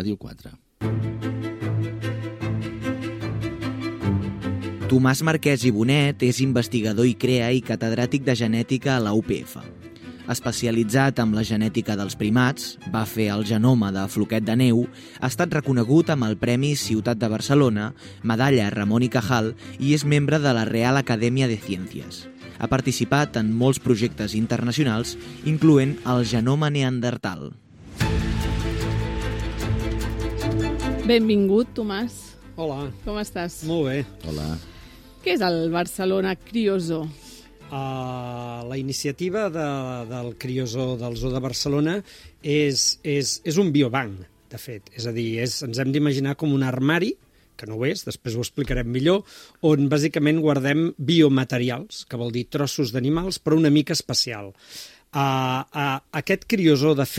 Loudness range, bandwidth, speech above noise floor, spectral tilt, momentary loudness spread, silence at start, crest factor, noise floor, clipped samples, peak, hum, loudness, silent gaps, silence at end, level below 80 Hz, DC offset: 6 LU; 16 kHz; 23 dB; -5.5 dB/octave; 12 LU; 0 s; 18 dB; -45 dBFS; under 0.1%; -4 dBFS; none; -23 LUFS; none; 0 s; -42 dBFS; under 0.1%